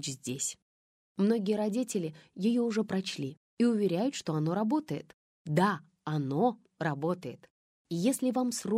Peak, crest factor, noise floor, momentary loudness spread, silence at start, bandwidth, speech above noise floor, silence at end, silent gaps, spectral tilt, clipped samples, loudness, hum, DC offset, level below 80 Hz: -14 dBFS; 18 dB; under -90 dBFS; 11 LU; 0 s; 16 kHz; over 60 dB; 0 s; 0.62-1.15 s, 3.37-3.57 s, 5.14-5.45 s, 7.50-7.85 s; -5.5 dB/octave; under 0.1%; -31 LUFS; none; under 0.1%; -76 dBFS